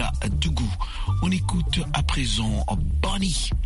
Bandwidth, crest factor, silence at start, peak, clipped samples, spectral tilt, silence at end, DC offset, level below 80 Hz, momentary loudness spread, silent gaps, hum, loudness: 11.5 kHz; 16 dB; 0 s; -6 dBFS; under 0.1%; -4.5 dB/octave; 0 s; under 0.1%; -26 dBFS; 3 LU; none; none; -25 LUFS